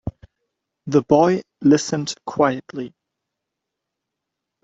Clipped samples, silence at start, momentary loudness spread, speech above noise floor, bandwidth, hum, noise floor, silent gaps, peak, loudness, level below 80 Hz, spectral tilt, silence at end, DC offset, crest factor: under 0.1%; 0.05 s; 18 LU; 64 dB; 8 kHz; none; -82 dBFS; none; -2 dBFS; -19 LUFS; -52 dBFS; -5.5 dB/octave; 1.75 s; under 0.1%; 20 dB